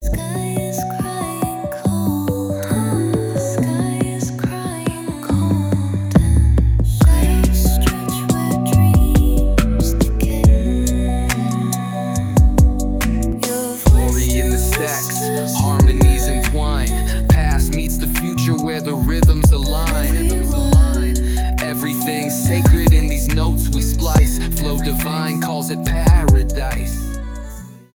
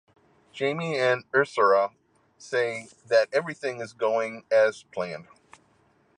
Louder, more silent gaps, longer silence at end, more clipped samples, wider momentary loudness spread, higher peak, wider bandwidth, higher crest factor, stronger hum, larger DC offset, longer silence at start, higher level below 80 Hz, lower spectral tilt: first, -17 LUFS vs -26 LUFS; neither; second, 0.2 s vs 0.95 s; neither; second, 8 LU vs 12 LU; first, 0 dBFS vs -8 dBFS; first, 19 kHz vs 10 kHz; about the same, 16 dB vs 18 dB; neither; neither; second, 0 s vs 0.55 s; first, -18 dBFS vs -76 dBFS; first, -6 dB/octave vs -4.5 dB/octave